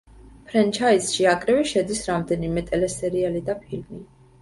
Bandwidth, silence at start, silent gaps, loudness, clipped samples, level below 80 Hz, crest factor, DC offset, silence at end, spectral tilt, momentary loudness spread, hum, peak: 11.5 kHz; 0.2 s; none; -22 LUFS; under 0.1%; -48 dBFS; 18 dB; under 0.1%; 0.35 s; -4.5 dB/octave; 13 LU; none; -6 dBFS